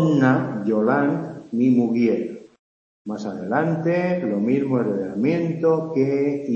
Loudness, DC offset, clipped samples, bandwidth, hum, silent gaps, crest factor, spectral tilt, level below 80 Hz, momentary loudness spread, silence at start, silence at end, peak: -21 LUFS; under 0.1%; under 0.1%; 7.2 kHz; none; 2.59-3.05 s; 16 dB; -9 dB/octave; -66 dBFS; 11 LU; 0 s; 0 s; -4 dBFS